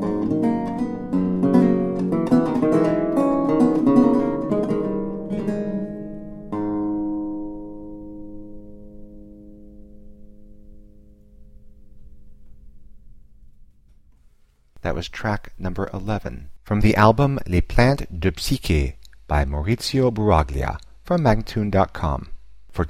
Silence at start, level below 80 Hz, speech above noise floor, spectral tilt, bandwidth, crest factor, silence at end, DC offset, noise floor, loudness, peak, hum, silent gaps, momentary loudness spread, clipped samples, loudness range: 0 s; -34 dBFS; 34 dB; -7 dB/octave; 15.5 kHz; 22 dB; 0 s; under 0.1%; -54 dBFS; -21 LUFS; 0 dBFS; none; none; 17 LU; under 0.1%; 14 LU